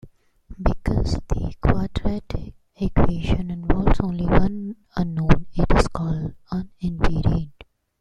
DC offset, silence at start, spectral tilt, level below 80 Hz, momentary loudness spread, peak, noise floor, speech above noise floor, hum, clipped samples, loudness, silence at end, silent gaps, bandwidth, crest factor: under 0.1%; 0.05 s; -7.5 dB/octave; -26 dBFS; 10 LU; 0 dBFS; -50 dBFS; 30 dB; none; under 0.1%; -24 LUFS; 0.5 s; none; 9.8 kHz; 20 dB